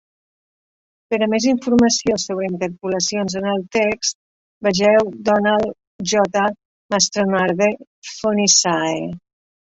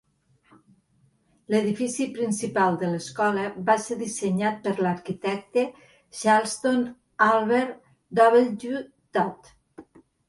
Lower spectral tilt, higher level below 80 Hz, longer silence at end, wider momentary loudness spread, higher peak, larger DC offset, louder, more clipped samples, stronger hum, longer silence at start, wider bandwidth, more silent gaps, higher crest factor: second, -3 dB/octave vs -5 dB/octave; first, -54 dBFS vs -68 dBFS; about the same, 0.5 s vs 0.5 s; about the same, 11 LU vs 10 LU; first, 0 dBFS vs -6 dBFS; neither; first, -18 LUFS vs -24 LUFS; neither; neither; second, 1.1 s vs 1.5 s; second, 8 kHz vs 11.5 kHz; first, 4.15-4.61 s, 5.87-5.99 s, 6.65-6.89 s, 7.87-8.02 s vs none; about the same, 18 dB vs 20 dB